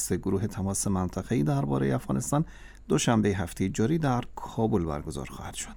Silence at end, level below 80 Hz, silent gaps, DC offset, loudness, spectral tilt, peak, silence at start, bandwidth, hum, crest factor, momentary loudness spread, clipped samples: 0 s; -46 dBFS; none; under 0.1%; -28 LUFS; -5.5 dB/octave; -8 dBFS; 0 s; 19 kHz; none; 20 dB; 11 LU; under 0.1%